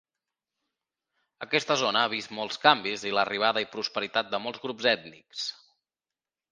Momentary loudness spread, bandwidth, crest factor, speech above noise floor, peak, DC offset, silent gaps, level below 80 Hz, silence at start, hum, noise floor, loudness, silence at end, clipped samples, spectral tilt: 12 LU; 10 kHz; 26 dB; over 62 dB; -2 dBFS; under 0.1%; none; -76 dBFS; 1.4 s; none; under -90 dBFS; -27 LUFS; 1 s; under 0.1%; -2.5 dB/octave